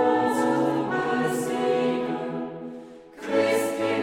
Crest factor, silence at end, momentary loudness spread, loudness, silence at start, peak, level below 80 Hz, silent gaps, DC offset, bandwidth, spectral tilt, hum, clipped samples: 14 dB; 0 s; 16 LU; -25 LUFS; 0 s; -10 dBFS; -66 dBFS; none; under 0.1%; 16.5 kHz; -5 dB/octave; none; under 0.1%